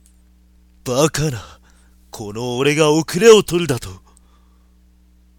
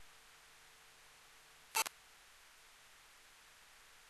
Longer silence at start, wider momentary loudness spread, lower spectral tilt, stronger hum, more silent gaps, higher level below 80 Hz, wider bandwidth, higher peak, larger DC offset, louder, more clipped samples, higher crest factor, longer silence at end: first, 0.85 s vs 0 s; about the same, 22 LU vs 23 LU; first, -4.5 dB/octave vs 2 dB/octave; neither; neither; first, -44 dBFS vs -80 dBFS; first, 17.5 kHz vs 13 kHz; first, 0 dBFS vs -20 dBFS; neither; first, -16 LUFS vs -39 LUFS; neither; second, 18 dB vs 30 dB; first, 1.45 s vs 0 s